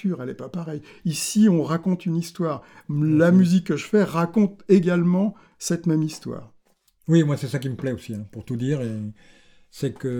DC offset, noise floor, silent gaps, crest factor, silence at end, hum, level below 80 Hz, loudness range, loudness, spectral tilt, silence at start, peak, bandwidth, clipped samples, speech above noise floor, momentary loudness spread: under 0.1%; -62 dBFS; none; 18 dB; 0 s; none; -60 dBFS; 6 LU; -22 LUFS; -6.5 dB/octave; 0.05 s; -6 dBFS; 18.5 kHz; under 0.1%; 40 dB; 15 LU